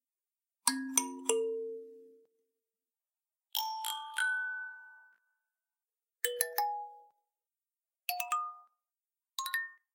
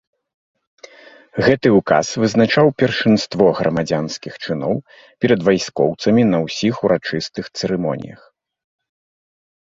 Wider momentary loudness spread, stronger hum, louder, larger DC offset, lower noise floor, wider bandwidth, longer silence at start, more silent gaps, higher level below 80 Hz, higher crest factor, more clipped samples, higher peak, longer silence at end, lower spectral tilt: first, 15 LU vs 11 LU; neither; second, -35 LUFS vs -17 LUFS; neither; first, under -90 dBFS vs -43 dBFS; first, 16.5 kHz vs 7.8 kHz; second, 0.65 s vs 1.35 s; neither; second, under -90 dBFS vs -52 dBFS; first, 32 dB vs 18 dB; neither; second, -8 dBFS vs 0 dBFS; second, 0.2 s vs 1.6 s; second, 1.5 dB/octave vs -5.5 dB/octave